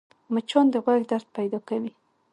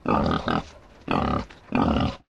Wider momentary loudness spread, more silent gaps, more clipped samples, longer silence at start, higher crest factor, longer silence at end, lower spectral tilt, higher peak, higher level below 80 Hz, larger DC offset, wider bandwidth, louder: about the same, 10 LU vs 9 LU; neither; neither; first, 0.3 s vs 0.05 s; about the same, 18 dB vs 16 dB; first, 0.45 s vs 0.15 s; second, -6 dB/octave vs -7.5 dB/octave; first, -6 dBFS vs -10 dBFS; second, -78 dBFS vs -38 dBFS; neither; about the same, 10.5 kHz vs 10 kHz; about the same, -25 LUFS vs -25 LUFS